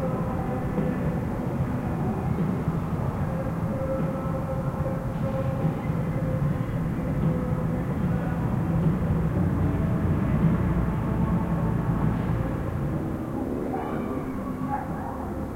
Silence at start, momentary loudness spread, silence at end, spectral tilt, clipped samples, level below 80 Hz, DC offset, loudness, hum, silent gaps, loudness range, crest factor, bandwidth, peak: 0 s; 5 LU; 0 s; -9.5 dB/octave; under 0.1%; -36 dBFS; under 0.1%; -27 LUFS; none; none; 3 LU; 16 dB; 16 kHz; -10 dBFS